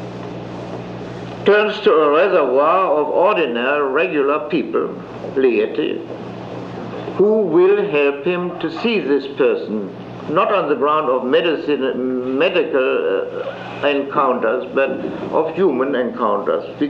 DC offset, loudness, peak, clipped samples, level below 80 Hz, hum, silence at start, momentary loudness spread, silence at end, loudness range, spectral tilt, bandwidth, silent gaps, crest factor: under 0.1%; -17 LUFS; -2 dBFS; under 0.1%; -58 dBFS; none; 0 s; 15 LU; 0 s; 3 LU; -7 dB/octave; 6.8 kHz; none; 16 dB